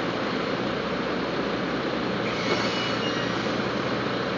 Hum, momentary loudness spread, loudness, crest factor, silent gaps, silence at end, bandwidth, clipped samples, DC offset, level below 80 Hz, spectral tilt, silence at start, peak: none; 3 LU; -26 LUFS; 16 dB; none; 0 s; 7.6 kHz; under 0.1%; under 0.1%; -52 dBFS; -5 dB/octave; 0 s; -12 dBFS